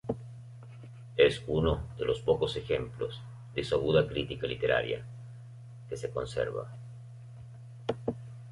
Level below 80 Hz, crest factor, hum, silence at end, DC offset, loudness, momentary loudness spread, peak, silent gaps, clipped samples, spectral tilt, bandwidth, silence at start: -50 dBFS; 22 dB; none; 0 s; under 0.1%; -31 LUFS; 22 LU; -10 dBFS; none; under 0.1%; -6.5 dB/octave; 11.5 kHz; 0.05 s